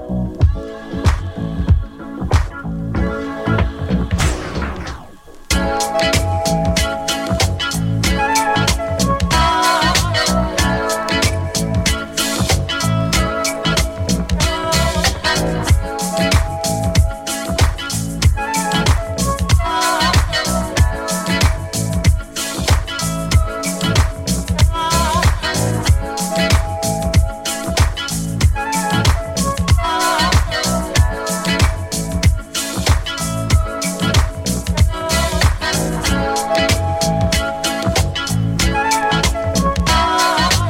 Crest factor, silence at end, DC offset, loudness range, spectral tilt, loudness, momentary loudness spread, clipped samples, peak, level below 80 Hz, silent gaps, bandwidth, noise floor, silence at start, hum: 16 dB; 0 s; under 0.1%; 3 LU; -4 dB/octave; -17 LUFS; 6 LU; under 0.1%; 0 dBFS; -24 dBFS; none; 16.5 kHz; -37 dBFS; 0 s; none